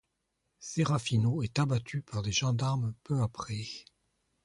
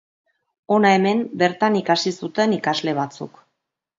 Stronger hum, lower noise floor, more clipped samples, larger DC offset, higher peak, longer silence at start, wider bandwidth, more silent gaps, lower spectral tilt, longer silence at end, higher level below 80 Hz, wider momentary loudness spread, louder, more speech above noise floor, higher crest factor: neither; about the same, -81 dBFS vs -78 dBFS; neither; neither; second, -16 dBFS vs -2 dBFS; about the same, 0.6 s vs 0.7 s; first, 11.5 kHz vs 7.8 kHz; neither; about the same, -5.5 dB/octave vs -5 dB/octave; about the same, 0.65 s vs 0.7 s; first, -58 dBFS vs -68 dBFS; about the same, 10 LU vs 10 LU; second, -32 LUFS vs -20 LUFS; second, 50 dB vs 59 dB; about the same, 16 dB vs 20 dB